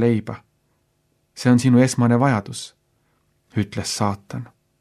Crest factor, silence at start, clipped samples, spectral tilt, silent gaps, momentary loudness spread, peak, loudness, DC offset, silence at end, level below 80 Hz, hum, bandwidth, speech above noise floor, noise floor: 18 dB; 0 s; under 0.1%; -6 dB/octave; none; 20 LU; -4 dBFS; -20 LUFS; under 0.1%; 0.35 s; -60 dBFS; none; 13 kHz; 48 dB; -67 dBFS